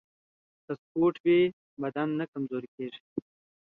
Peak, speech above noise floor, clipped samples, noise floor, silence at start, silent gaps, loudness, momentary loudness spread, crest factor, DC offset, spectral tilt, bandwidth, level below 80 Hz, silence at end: -14 dBFS; over 61 dB; under 0.1%; under -90 dBFS; 0.7 s; 0.79-0.95 s, 1.20-1.24 s, 1.53-1.77 s, 2.28-2.33 s, 2.68-2.78 s, 3.00-3.16 s; -29 LUFS; 16 LU; 16 dB; under 0.1%; -9.5 dB/octave; 4.2 kHz; -72 dBFS; 0.4 s